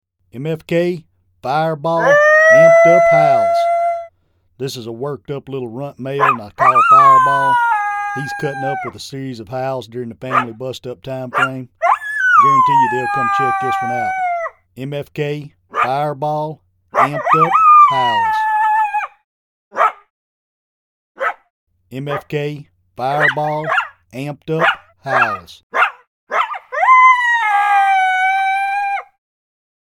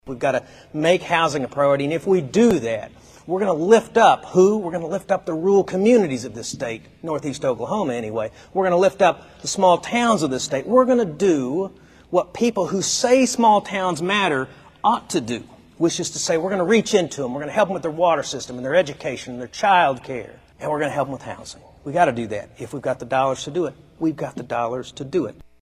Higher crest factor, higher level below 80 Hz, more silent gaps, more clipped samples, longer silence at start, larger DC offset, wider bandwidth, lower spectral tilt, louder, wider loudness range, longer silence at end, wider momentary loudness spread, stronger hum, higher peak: about the same, 16 dB vs 18 dB; about the same, -60 dBFS vs -56 dBFS; first, 19.24-19.71 s, 20.10-21.15 s, 21.50-21.67 s, 25.63-25.70 s, 26.07-26.27 s vs none; neither; first, 0.35 s vs 0.05 s; neither; first, 16 kHz vs 14 kHz; about the same, -5 dB/octave vs -4.5 dB/octave; first, -14 LUFS vs -20 LUFS; first, 10 LU vs 6 LU; first, 0.9 s vs 0.3 s; first, 19 LU vs 13 LU; neither; about the same, 0 dBFS vs -2 dBFS